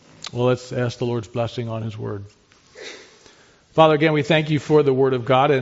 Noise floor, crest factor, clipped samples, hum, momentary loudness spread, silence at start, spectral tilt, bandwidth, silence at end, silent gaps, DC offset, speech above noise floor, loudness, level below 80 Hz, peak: -52 dBFS; 20 dB; under 0.1%; none; 18 LU; 0.35 s; -5 dB/octave; 8 kHz; 0 s; none; under 0.1%; 33 dB; -20 LUFS; -58 dBFS; -2 dBFS